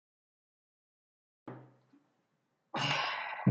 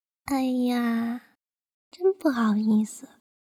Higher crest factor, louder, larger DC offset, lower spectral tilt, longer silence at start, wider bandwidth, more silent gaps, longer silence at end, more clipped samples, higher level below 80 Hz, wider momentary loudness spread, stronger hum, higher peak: first, 24 dB vs 16 dB; second, -34 LUFS vs -25 LUFS; neither; about the same, -5 dB/octave vs -6 dB/octave; first, 1.45 s vs 0.25 s; second, 9.2 kHz vs 15.5 kHz; second, none vs 1.74-1.91 s; second, 0 s vs 0.5 s; neither; second, -82 dBFS vs -64 dBFS; first, 21 LU vs 10 LU; neither; second, -16 dBFS vs -10 dBFS